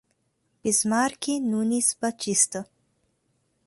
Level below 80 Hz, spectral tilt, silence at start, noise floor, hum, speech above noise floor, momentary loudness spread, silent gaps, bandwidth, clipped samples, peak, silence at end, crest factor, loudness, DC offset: -68 dBFS; -2.5 dB/octave; 0.65 s; -72 dBFS; none; 48 dB; 7 LU; none; 12 kHz; under 0.1%; -8 dBFS; 1.05 s; 20 dB; -24 LUFS; under 0.1%